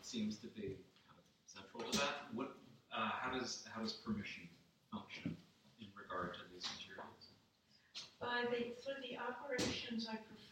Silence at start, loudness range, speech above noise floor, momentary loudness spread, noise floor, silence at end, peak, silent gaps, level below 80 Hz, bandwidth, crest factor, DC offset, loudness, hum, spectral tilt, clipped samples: 0 s; 7 LU; 28 dB; 17 LU; -73 dBFS; 0 s; -26 dBFS; none; -74 dBFS; 16 kHz; 20 dB; under 0.1%; -45 LUFS; none; -3.5 dB/octave; under 0.1%